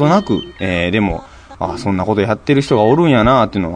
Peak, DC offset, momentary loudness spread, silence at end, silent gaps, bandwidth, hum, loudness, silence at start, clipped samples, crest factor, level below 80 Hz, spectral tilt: 0 dBFS; under 0.1%; 10 LU; 0 s; none; 10 kHz; none; -15 LUFS; 0 s; under 0.1%; 14 dB; -36 dBFS; -7 dB/octave